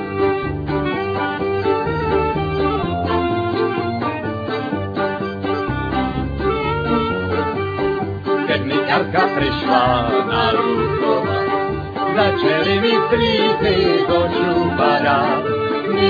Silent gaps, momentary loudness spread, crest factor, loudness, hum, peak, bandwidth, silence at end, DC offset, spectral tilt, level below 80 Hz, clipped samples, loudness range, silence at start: none; 6 LU; 16 dB; -18 LUFS; none; -2 dBFS; 5 kHz; 0 s; under 0.1%; -8 dB/octave; -38 dBFS; under 0.1%; 5 LU; 0 s